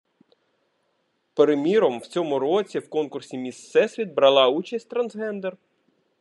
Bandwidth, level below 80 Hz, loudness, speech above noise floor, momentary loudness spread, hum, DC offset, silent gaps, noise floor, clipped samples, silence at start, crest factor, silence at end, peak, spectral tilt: 11 kHz; -82 dBFS; -23 LUFS; 49 dB; 14 LU; none; under 0.1%; none; -71 dBFS; under 0.1%; 1.35 s; 20 dB; 0.65 s; -4 dBFS; -5 dB/octave